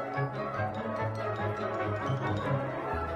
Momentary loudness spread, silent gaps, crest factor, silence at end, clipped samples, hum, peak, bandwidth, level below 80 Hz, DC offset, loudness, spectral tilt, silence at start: 2 LU; none; 14 dB; 0 s; under 0.1%; none; -18 dBFS; 11 kHz; -52 dBFS; under 0.1%; -33 LUFS; -7.5 dB/octave; 0 s